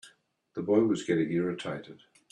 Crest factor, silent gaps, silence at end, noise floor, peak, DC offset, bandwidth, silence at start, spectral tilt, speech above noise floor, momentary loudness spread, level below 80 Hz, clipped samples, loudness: 20 dB; none; 0.35 s; -64 dBFS; -10 dBFS; under 0.1%; 10.5 kHz; 0.05 s; -6.5 dB/octave; 35 dB; 14 LU; -72 dBFS; under 0.1%; -29 LUFS